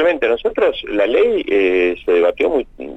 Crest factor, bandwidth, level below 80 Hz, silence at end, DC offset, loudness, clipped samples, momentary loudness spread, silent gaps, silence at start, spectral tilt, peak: 12 dB; 8 kHz; -44 dBFS; 0 s; under 0.1%; -16 LUFS; under 0.1%; 4 LU; none; 0 s; -5.5 dB/octave; -4 dBFS